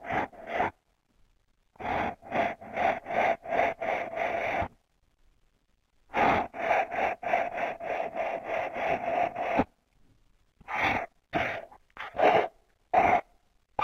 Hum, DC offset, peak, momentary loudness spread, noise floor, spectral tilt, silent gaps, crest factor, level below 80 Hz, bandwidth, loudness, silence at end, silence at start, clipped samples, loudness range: none; under 0.1%; -10 dBFS; 9 LU; -70 dBFS; -5.5 dB/octave; none; 20 dB; -56 dBFS; 15 kHz; -29 LUFS; 0 s; 0 s; under 0.1%; 3 LU